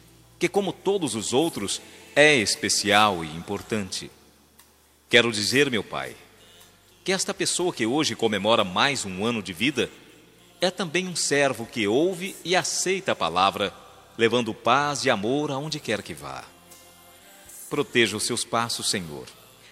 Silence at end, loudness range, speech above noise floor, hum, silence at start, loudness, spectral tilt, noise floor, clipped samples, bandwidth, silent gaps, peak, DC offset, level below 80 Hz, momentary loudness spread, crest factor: 0.4 s; 5 LU; 33 dB; none; 0.4 s; -24 LUFS; -3 dB/octave; -58 dBFS; under 0.1%; 16 kHz; none; -2 dBFS; under 0.1%; -64 dBFS; 13 LU; 24 dB